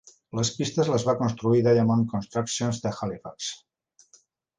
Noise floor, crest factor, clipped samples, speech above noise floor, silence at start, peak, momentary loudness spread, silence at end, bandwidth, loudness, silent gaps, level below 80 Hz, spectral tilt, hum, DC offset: -61 dBFS; 18 dB; under 0.1%; 36 dB; 0.35 s; -8 dBFS; 13 LU; 1 s; 10 kHz; -25 LUFS; none; -58 dBFS; -5.5 dB/octave; none; under 0.1%